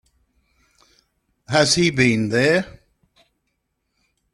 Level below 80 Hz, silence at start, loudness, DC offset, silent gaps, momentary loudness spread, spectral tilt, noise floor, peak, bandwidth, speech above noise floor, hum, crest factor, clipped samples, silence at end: -54 dBFS; 1.5 s; -18 LUFS; under 0.1%; none; 6 LU; -4 dB/octave; -74 dBFS; -2 dBFS; 12.5 kHz; 56 dB; none; 22 dB; under 0.1%; 1.65 s